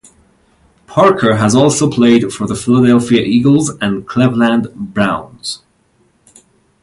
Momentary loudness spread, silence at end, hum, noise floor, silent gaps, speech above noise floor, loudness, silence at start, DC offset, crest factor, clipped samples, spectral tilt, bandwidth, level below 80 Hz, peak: 11 LU; 1.25 s; none; -55 dBFS; none; 44 dB; -12 LUFS; 0.9 s; under 0.1%; 14 dB; under 0.1%; -5.5 dB/octave; 11.5 kHz; -46 dBFS; 0 dBFS